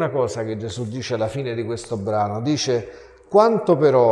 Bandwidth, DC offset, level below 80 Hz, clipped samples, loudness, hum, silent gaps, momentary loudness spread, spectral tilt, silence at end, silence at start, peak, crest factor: 11 kHz; under 0.1%; -52 dBFS; under 0.1%; -21 LUFS; none; none; 11 LU; -6 dB/octave; 0 s; 0 s; -2 dBFS; 18 dB